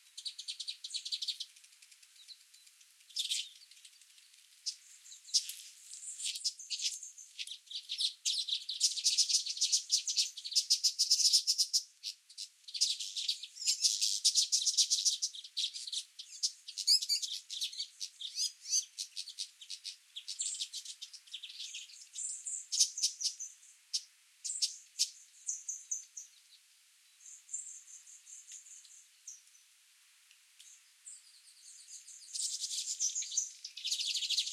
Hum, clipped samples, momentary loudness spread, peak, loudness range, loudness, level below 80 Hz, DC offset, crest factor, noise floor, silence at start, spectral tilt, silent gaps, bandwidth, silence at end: none; under 0.1%; 22 LU; -14 dBFS; 19 LU; -33 LUFS; under -90 dBFS; under 0.1%; 24 dB; -66 dBFS; 0.15 s; 11 dB/octave; none; 16 kHz; 0 s